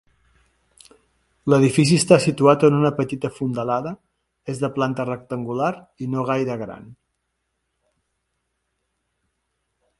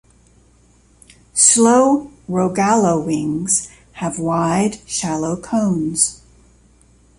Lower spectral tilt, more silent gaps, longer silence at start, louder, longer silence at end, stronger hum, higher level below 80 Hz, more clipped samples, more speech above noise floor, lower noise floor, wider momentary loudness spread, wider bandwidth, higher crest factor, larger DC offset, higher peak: first, -6 dB/octave vs -4 dB/octave; neither; about the same, 1.45 s vs 1.35 s; second, -20 LUFS vs -16 LUFS; first, 3.05 s vs 1.05 s; neither; second, -58 dBFS vs -50 dBFS; neither; first, 56 dB vs 36 dB; first, -75 dBFS vs -52 dBFS; first, 17 LU vs 11 LU; about the same, 11.5 kHz vs 11.5 kHz; about the same, 22 dB vs 18 dB; neither; about the same, 0 dBFS vs 0 dBFS